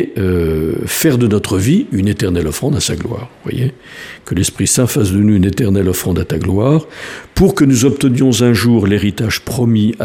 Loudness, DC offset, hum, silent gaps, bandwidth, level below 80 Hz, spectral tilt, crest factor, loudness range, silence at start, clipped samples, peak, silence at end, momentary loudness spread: -14 LUFS; under 0.1%; none; none; 16 kHz; -34 dBFS; -5.5 dB/octave; 14 dB; 4 LU; 0 s; under 0.1%; 0 dBFS; 0 s; 10 LU